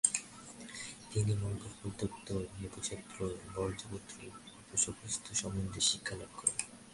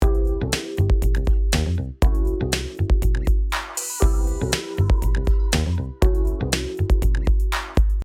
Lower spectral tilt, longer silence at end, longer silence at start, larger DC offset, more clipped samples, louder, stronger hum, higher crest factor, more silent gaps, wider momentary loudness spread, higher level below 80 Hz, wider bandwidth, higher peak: second, -3 dB/octave vs -5 dB/octave; about the same, 0 s vs 0 s; about the same, 0.05 s vs 0 s; neither; neither; second, -37 LUFS vs -22 LUFS; neither; first, 28 dB vs 16 dB; neither; first, 15 LU vs 3 LU; second, -58 dBFS vs -20 dBFS; second, 11.5 kHz vs 15.5 kHz; second, -10 dBFS vs -4 dBFS